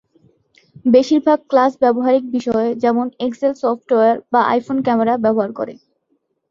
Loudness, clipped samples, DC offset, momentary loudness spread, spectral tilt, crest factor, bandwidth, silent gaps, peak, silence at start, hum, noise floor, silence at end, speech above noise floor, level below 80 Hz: -16 LUFS; under 0.1%; under 0.1%; 7 LU; -6.5 dB/octave; 16 dB; 7.4 kHz; none; -2 dBFS; 0.85 s; none; -67 dBFS; 0.75 s; 51 dB; -60 dBFS